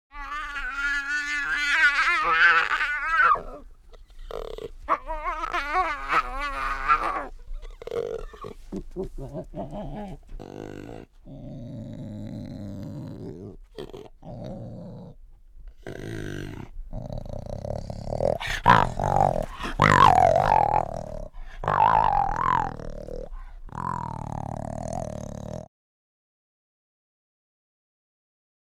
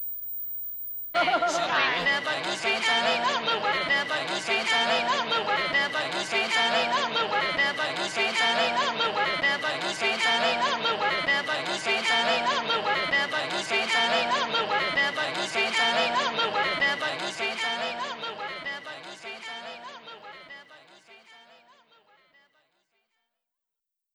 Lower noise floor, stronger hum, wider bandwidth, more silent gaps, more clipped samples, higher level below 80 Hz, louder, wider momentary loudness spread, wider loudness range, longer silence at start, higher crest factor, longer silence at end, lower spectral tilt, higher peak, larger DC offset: second, -47 dBFS vs -86 dBFS; neither; about the same, 15 kHz vs 16.5 kHz; neither; neither; first, -40 dBFS vs -66 dBFS; about the same, -24 LUFS vs -25 LUFS; first, 22 LU vs 11 LU; first, 18 LU vs 10 LU; first, 0.15 s vs 0 s; first, 26 dB vs 16 dB; first, 3 s vs 2.75 s; first, -5 dB/octave vs -1.5 dB/octave; first, 0 dBFS vs -12 dBFS; neither